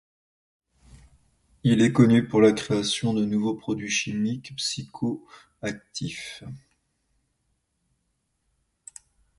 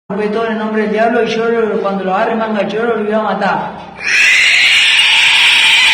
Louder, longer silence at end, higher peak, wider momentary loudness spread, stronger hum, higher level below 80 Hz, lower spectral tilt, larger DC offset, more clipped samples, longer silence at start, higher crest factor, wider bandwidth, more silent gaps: second, -24 LUFS vs -10 LUFS; first, 2.8 s vs 0 s; second, -6 dBFS vs -2 dBFS; first, 19 LU vs 10 LU; neither; second, -60 dBFS vs -52 dBFS; first, -5.5 dB/octave vs -2.5 dB/octave; neither; neither; first, 1.65 s vs 0.1 s; first, 22 dB vs 10 dB; second, 11.5 kHz vs over 20 kHz; neither